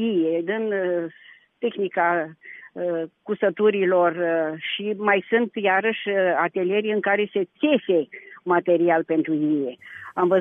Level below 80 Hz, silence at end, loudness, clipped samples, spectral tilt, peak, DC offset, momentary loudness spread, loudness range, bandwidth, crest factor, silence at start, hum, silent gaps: -74 dBFS; 0 s; -23 LUFS; under 0.1%; -8.5 dB/octave; -6 dBFS; under 0.1%; 10 LU; 3 LU; 3.8 kHz; 16 dB; 0 s; none; none